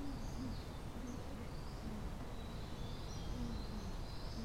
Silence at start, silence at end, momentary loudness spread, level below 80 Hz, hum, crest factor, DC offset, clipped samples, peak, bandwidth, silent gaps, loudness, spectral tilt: 0 s; 0 s; 3 LU; -48 dBFS; none; 14 dB; under 0.1%; under 0.1%; -32 dBFS; 16 kHz; none; -48 LUFS; -6 dB/octave